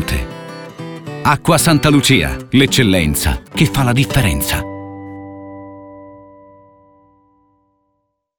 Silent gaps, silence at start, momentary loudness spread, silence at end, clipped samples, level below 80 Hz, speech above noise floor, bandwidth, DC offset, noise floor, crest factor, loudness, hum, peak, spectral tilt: none; 0 s; 21 LU; 2.15 s; under 0.1%; -30 dBFS; 56 dB; over 20 kHz; under 0.1%; -69 dBFS; 16 dB; -14 LUFS; none; 0 dBFS; -4.5 dB/octave